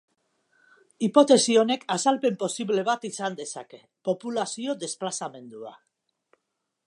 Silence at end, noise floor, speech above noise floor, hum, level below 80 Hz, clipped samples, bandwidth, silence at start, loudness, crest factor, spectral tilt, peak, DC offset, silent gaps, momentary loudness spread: 1.15 s; -81 dBFS; 56 dB; none; -82 dBFS; under 0.1%; 11.5 kHz; 1 s; -25 LUFS; 22 dB; -3.5 dB/octave; -4 dBFS; under 0.1%; none; 20 LU